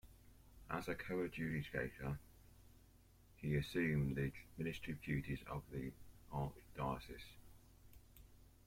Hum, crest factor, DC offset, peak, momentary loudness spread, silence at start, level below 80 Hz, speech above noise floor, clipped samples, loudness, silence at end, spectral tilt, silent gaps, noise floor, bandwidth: none; 18 dB; under 0.1%; -28 dBFS; 23 LU; 0.05 s; -60 dBFS; 24 dB; under 0.1%; -44 LUFS; 0.15 s; -7 dB/octave; none; -67 dBFS; 16.5 kHz